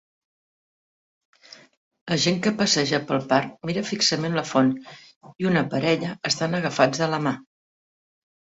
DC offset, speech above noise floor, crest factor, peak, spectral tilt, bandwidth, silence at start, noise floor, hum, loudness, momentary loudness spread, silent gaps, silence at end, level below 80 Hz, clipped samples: under 0.1%; over 67 dB; 22 dB; -4 dBFS; -4 dB/octave; 8.4 kHz; 2.05 s; under -90 dBFS; none; -23 LUFS; 8 LU; 5.16-5.21 s; 1.05 s; -62 dBFS; under 0.1%